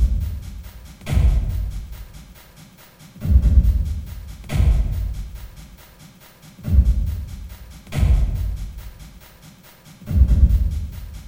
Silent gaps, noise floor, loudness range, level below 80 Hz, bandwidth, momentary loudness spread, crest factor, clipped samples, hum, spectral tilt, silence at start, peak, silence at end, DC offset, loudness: none; -46 dBFS; 4 LU; -22 dBFS; 16.5 kHz; 23 LU; 18 dB; under 0.1%; none; -7.5 dB/octave; 0 s; -2 dBFS; 0 s; under 0.1%; -21 LUFS